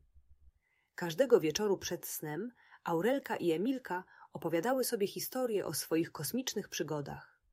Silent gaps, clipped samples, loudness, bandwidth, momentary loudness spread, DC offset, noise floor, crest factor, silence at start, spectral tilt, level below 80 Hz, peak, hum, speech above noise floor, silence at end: none; under 0.1%; -35 LUFS; 16 kHz; 13 LU; under 0.1%; -71 dBFS; 20 dB; 0.15 s; -4 dB/octave; -70 dBFS; -14 dBFS; none; 37 dB; 0.3 s